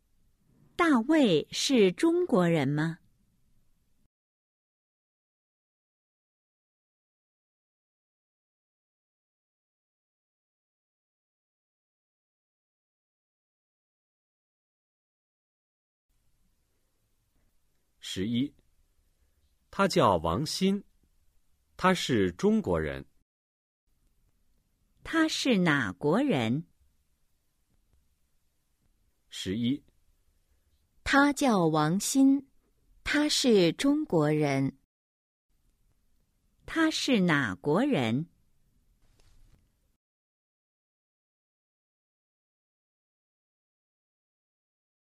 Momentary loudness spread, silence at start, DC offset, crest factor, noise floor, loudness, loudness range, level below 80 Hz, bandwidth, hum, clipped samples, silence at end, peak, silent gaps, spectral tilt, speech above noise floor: 12 LU; 0.8 s; under 0.1%; 24 dB; -73 dBFS; -27 LUFS; 13 LU; -60 dBFS; 15.5 kHz; none; under 0.1%; 6.9 s; -8 dBFS; 4.06-16.09 s, 23.22-23.87 s, 34.85-35.49 s; -5 dB/octave; 47 dB